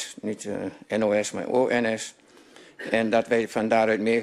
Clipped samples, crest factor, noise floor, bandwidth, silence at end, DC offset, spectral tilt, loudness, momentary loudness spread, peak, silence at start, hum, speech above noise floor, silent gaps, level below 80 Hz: under 0.1%; 18 dB; -51 dBFS; 13 kHz; 0 s; under 0.1%; -4.5 dB/octave; -25 LUFS; 11 LU; -8 dBFS; 0 s; none; 27 dB; none; -64 dBFS